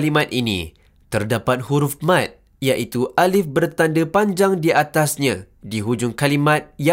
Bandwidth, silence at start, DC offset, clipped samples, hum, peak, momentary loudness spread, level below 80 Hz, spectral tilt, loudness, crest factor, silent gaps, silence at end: 16 kHz; 0 s; under 0.1%; under 0.1%; none; -2 dBFS; 9 LU; -52 dBFS; -5 dB/octave; -19 LUFS; 16 dB; none; 0 s